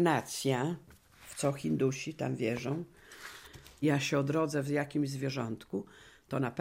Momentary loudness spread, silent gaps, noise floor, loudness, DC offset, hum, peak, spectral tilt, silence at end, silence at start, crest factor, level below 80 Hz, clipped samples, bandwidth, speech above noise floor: 17 LU; none; -54 dBFS; -33 LUFS; under 0.1%; none; -16 dBFS; -5.5 dB/octave; 0 s; 0 s; 18 dB; -66 dBFS; under 0.1%; 16 kHz; 22 dB